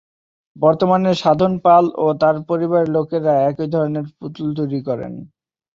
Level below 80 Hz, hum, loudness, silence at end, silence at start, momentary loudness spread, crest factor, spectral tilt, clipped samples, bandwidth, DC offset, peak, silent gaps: -56 dBFS; none; -17 LUFS; 0.5 s; 0.55 s; 13 LU; 16 dB; -8 dB/octave; under 0.1%; 7.6 kHz; under 0.1%; -2 dBFS; none